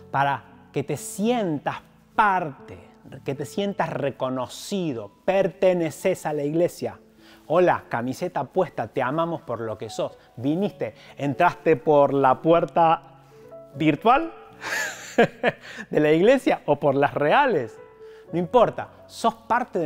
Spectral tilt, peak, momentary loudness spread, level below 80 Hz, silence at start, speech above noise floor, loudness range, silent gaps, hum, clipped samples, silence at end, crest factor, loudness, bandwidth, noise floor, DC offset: -6 dB/octave; -6 dBFS; 13 LU; -56 dBFS; 0.15 s; 23 dB; 6 LU; none; none; under 0.1%; 0 s; 18 dB; -23 LUFS; 16 kHz; -46 dBFS; under 0.1%